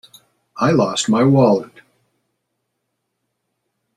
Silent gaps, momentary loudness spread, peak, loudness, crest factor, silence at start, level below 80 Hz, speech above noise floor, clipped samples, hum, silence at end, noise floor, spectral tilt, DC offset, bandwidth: none; 7 LU; -2 dBFS; -16 LUFS; 18 dB; 0.55 s; -58 dBFS; 60 dB; under 0.1%; none; 2.3 s; -74 dBFS; -6 dB/octave; under 0.1%; 12 kHz